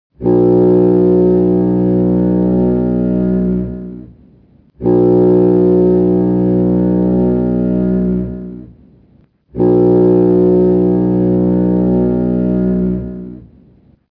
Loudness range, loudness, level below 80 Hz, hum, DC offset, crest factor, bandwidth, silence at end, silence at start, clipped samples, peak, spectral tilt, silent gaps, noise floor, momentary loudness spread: 4 LU; -12 LUFS; -34 dBFS; none; under 0.1%; 10 dB; 2.9 kHz; 0.75 s; 0.2 s; under 0.1%; -2 dBFS; -13.5 dB/octave; none; -50 dBFS; 10 LU